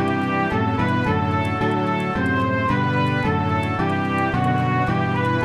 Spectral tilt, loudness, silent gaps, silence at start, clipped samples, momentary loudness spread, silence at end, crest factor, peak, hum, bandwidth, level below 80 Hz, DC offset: -7.5 dB/octave; -21 LUFS; none; 0 s; under 0.1%; 2 LU; 0 s; 12 dB; -8 dBFS; none; 11.5 kHz; -44 dBFS; 0.2%